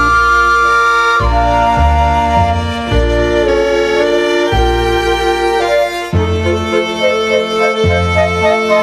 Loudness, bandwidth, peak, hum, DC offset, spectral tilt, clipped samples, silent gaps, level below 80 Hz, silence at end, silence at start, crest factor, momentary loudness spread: -12 LUFS; 14 kHz; 0 dBFS; none; under 0.1%; -5.5 dB/octave; under 0.1%; none; -22 dBFS; 0 s; 0 s; 12 dB; 5 LU